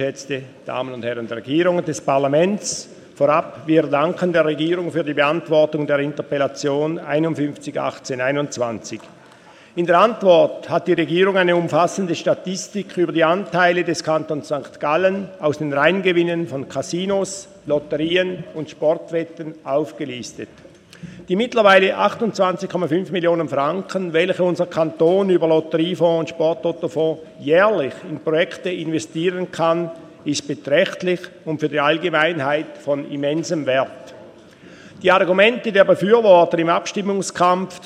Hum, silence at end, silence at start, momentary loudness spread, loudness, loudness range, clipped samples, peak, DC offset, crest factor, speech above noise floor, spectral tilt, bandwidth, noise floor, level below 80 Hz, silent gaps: none; 0 s; 0 s; 12 LU; -19 LUFS; 5 LU; under 0.1%; 0 dBFS; under 0.1%; 18 dB; 27 dB; -5 dB/octave; 12 kHz; -46 dBFS; -64 dBFS; none